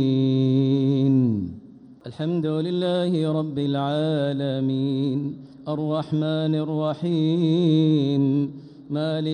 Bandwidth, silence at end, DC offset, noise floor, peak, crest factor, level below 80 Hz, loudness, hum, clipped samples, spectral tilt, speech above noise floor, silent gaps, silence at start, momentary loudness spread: 9.6 kHz; 0 s; under 0.1%; -45 dBFS; -10 dBFS; 12 dB; -64 dBFS; -23 LUFS; none; under 0.1%; -9 dB/octave; 23 dB; none; 0 s; 11 LU